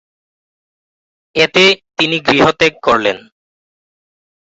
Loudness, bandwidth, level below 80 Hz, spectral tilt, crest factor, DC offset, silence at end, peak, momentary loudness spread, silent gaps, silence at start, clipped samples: -12 LUFS; 8.2 kHz; -50 dBFS; -4 dB/octave; 16 dB; under 0.1%; 1.4 s; 0 dBFS; 9 LU; none; 1.35 s; under 0.1%